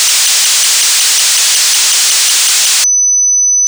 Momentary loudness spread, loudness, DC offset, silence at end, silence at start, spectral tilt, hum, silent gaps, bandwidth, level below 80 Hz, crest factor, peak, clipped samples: 0 LU; -6 LUFS; under 0.1%; 0 s; 0 s; 5 dB/octave; none; none; over 20 kHz; -66 dBFS; 4 dB; -6 dBFS; under 0.1%